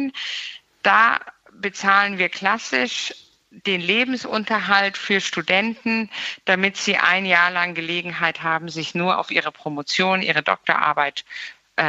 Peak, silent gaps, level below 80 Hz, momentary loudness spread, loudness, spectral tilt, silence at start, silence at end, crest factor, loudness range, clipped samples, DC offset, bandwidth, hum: -2 dBFS; none; -68 dBFS; 11 LU; -20 LUFS; -3.5 dB/octave; 0 s; 0 s; 20 dB; 2 LU; under 0.1%; under 0.1%; 8.2 kHz; none